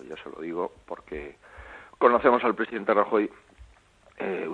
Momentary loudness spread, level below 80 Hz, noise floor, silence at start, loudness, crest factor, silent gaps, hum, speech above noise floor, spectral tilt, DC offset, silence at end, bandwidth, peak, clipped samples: 22 LU; -56 dBFS; -58 dBFS; 0 s; -25 LUFS; 24 dB; none; none; 32 dB; -7 dB/octave; under 0.1%; 0 s; 9.4 kHz; -4 dBFS; under 0.1%